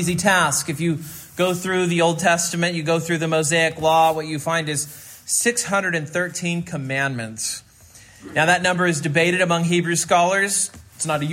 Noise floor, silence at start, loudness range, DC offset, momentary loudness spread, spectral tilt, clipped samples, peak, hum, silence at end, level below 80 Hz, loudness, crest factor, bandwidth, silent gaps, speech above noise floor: -47 dBFS; 0 s; 4 LU; under 0.1%; 9 LU; -3.5 dB/octave; under 0.1%; -2 dBFS; none; 0 s; -58 dBFS; -20 LUFS; 18 dB; 16.5 kHz; none; 27 dB